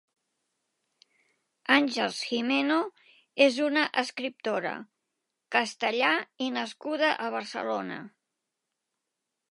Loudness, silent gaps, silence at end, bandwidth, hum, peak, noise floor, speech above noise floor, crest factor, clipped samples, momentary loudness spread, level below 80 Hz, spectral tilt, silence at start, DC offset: -27 LUFS; none; 1.45 s; 11.5 kHz; none; -6 dBFS; -85 dBFS; 57 dB; 24 dB; under 0.1%; 12 LU; -86 dBFS; -3 dB/octave; 1.7 s; under 0.1%